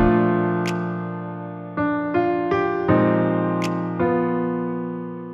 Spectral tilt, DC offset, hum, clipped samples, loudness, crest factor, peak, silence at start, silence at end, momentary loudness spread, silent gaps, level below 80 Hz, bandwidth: -8 dB/octave; under 0.1%; none; under 0.1%; -22 LUFS; 16 dB; -6 dBFS; 0 s; 0 s; 12 LU; none; -42 dBFS; 10.5 kHz